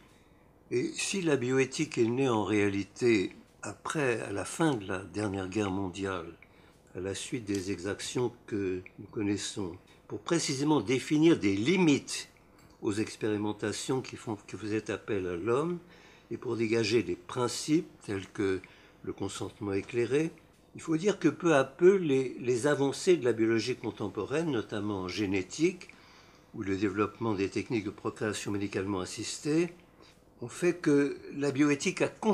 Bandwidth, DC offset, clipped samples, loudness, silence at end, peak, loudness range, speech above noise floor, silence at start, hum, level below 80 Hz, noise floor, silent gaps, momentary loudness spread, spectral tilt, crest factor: 13 kHz; under 0.1%; under 0.1%; -31 LUFS; 0 s; -10 dBFS; 7 LU; 30 dB; 0.7 s; none; -68 dBFS; -60 dBFS; none; 12 LU; -5 dB/octave; 20 dB